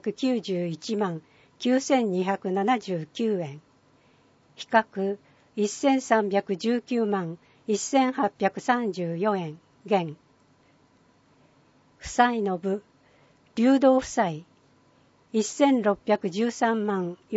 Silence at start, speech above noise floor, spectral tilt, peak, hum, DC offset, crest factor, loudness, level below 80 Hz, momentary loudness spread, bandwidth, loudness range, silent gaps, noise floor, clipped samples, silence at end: 0.05 s; 36 dB; -5 dB/octave; -6 dBFS; none; under 0.1%; 22 dB; -26 LUFS; -64 dBFS; 11 LU; 8 kHz; 5 LU; none; -61 dBFS; under 0.1%; 0 s